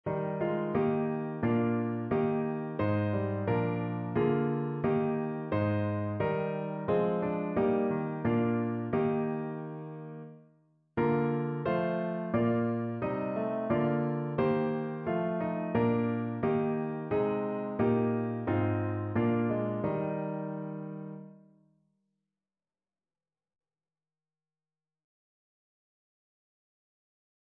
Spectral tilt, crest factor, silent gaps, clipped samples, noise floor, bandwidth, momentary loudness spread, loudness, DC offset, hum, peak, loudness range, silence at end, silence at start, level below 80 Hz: -11.5 dB/octave; 16 dB; none; under 0.1%; under -90 dBFS; 4.5 kHz; 6 LU; -31 LUFS; under 0.1%; none; -16 dBFS; 3 LU; 6.05 s; 0.05 s; -64 dBFS